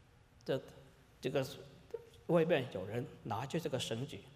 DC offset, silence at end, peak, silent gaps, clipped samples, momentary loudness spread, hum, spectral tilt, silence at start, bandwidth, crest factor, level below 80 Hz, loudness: under 0.1%; 0 s; -18 dBFS; none; under 0.1%; 17 LU; none; -5.5 dB/octave; 0.45 s; 15.5 kHz; 20 dB; -70 dBFS; -38 LUFS